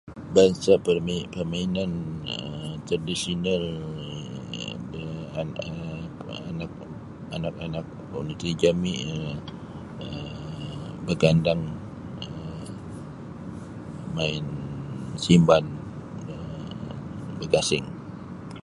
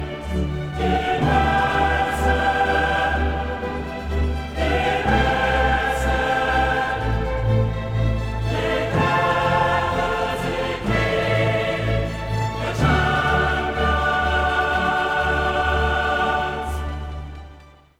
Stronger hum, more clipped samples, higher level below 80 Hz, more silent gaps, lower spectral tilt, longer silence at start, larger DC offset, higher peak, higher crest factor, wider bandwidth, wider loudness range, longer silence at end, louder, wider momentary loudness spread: neither; neither; second, -48 dBFS vs -28 dBFS; neither; about the same, -6 dB/octave vs -6 dB/octave; about the same, 0.05 s vs 0 s; neither; about the same, -4 dBFS vs -4 dBFS; first, 24 dB vs 16 dB; second, 11.5 kHz vs 15.5 kHz; first, 9 LU vs 2 LU; second, 0.05 s vs 0.3 s; second, -27 LUFS vs -21 LUFS; first, 18 LU vs 7 LU